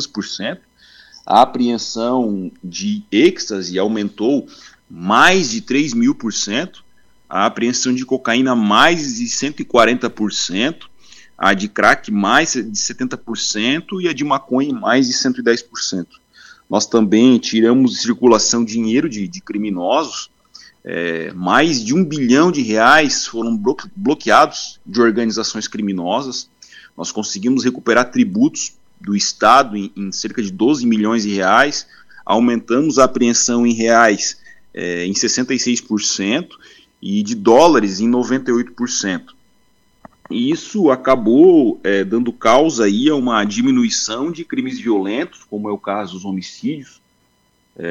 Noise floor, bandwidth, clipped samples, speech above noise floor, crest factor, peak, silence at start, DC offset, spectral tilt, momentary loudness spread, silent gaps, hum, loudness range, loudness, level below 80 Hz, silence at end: -60 dBFS; 10 kHz; under 0.1%; 44 dB; 16 dB; 0 dBFS; 0 s; under 0.1%; -3.5 dB/octave; 13 LU; none; none; 5 LU; -16 LUFS; -56 dBFS; 0 s